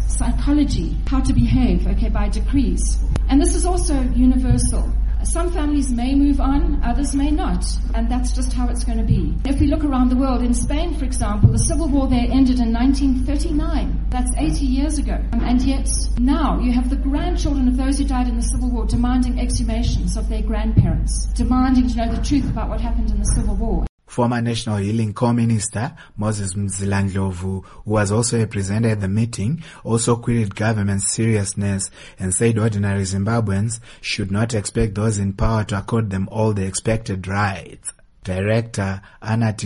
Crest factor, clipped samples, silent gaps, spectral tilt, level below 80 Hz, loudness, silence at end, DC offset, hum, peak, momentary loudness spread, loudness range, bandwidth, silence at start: 16 dB; under 0.1%; 23.89-23.98 s; -6 dB/octave; -22 dBFS; -20 LUFS; 0 s; under 0.1%; none; -2 dBFS; 6 LU; 3 LU; 11.5 kHz; 0 s